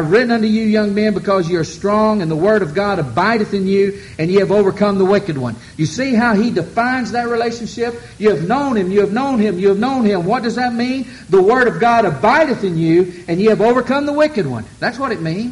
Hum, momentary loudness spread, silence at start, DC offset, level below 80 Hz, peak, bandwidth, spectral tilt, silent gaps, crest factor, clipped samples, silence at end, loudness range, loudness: none; 8 LU; 0 s; under 0.1%; -46 dBFS; -2 dBFS; 11.5 kHz; -6.5 dB/octave; none; 12 dB; under 0.1%; 0 s; 3 LU; -15 LUFS